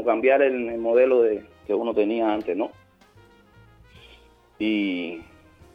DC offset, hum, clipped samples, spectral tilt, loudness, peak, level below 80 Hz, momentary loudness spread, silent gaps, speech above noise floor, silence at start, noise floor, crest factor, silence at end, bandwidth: under 0.1%; none; under 0.1%; -7 dB/octave; -23 LUFS; -6 dBFS; -60 dBFS; 12 LU; none; 32 dB; 0 s; -54 dBFS; 18 dB; 0.5 s; 5.4 kHz